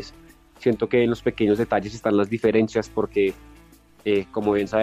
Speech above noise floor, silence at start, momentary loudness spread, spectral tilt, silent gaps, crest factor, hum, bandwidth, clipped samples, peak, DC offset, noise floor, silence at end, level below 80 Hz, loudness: 29 dB; 0 s; 5 LU; -6.5 dB/octave; none; 16 dB; none; 14 kHz; under 0.1%; -8 dBFS; under 0.1%; -51 dBFS; 0 s; -50 dBFS; -23 LUFS